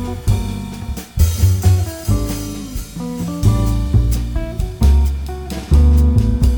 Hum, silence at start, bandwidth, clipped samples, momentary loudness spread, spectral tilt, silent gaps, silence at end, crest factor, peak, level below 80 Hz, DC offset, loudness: none; 0 s; over 20 kHz; under 0.1%; 13 LU; -6.5 dB/octave; none; 0 s; 14 dB; -2 dBFS; -18 dBFS; under 0.1%; -17 LUFS